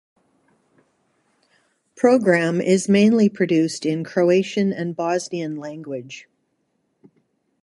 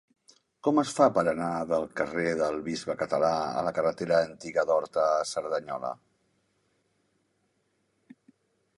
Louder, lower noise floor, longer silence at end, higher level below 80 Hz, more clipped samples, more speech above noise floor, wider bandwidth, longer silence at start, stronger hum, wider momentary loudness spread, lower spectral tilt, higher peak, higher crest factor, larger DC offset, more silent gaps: first, -19 LUFS vs -28 LUFS; second, -70 dBFS vs -74 dBFS; second, 1.4 s vs 2.85 s; about the same, -68 dBFS vs -66 dBFS; neither; first, 51 dB vs 46 dB; about the same, 11.5 kHz vs 11.5 kHz; first, 2 s vs 0.65 s; neither; first, 16 LU vs 9 LU; about the same, -6 dB/octave vs -5 dB/octave; first, -2 dBFS vs -6 dBFS; about the same, 18 dB vs 22 dB; neither; neither